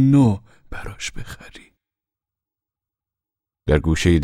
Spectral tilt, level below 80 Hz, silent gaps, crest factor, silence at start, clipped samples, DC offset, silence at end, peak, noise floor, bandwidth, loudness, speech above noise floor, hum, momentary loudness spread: -6.5 dB/octave; -34 dBFS; none; 20 dB; 0 s; under 0.1%; under 0.1%; 0 s; -2 dBFS; -88 dBFS; 14 kHz; -20 LUFS; 70 dB; none; 21 LU